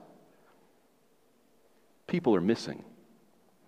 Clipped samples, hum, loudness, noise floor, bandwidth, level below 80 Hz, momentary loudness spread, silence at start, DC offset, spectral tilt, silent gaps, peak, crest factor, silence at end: under 0.1%; none; -30 LUFS; -68 dBFS; 11 kHz; -72 dBFS; 19 LU; 2.1 s; under 0.1%; -7 dB/octave; none; -14 dBFS; 22 dB; 0.85 s